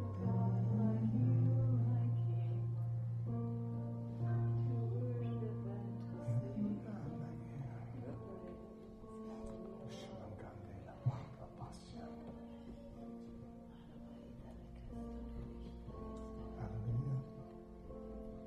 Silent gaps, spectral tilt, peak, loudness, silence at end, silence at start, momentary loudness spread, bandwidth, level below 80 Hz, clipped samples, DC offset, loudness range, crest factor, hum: none; -10 dB/octave; -24 dBFS; -41 LUFS; 0 s; 0 s; 18 LU; 5.6 kHz; -58 dBFS; under 0.1%; under 0.1%; 15 LU; 16 dB; none